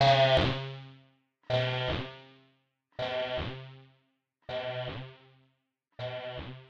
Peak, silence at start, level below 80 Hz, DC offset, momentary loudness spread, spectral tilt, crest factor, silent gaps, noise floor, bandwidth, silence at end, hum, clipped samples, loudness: -12 dBFS; 0 s; -52 dBFS; under 0.1%; 24 LU; -6 dB/octave; 22 dB; none; -77 dBFS; 7.8 kHz; 0.05 s; none; under 0.1%; -31 LUFS